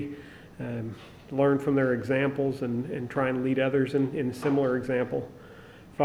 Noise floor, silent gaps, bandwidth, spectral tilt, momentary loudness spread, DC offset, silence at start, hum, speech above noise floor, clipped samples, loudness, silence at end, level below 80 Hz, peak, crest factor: -48 dBFS; none; 12.5 kHz; -8 dB/octave; 19 LU; under 0.1%; 0 s; none; 22 dB; under 0.1%; -28 LUFS; 0 s; -60 dBFS; -10 dBFS; 18 dB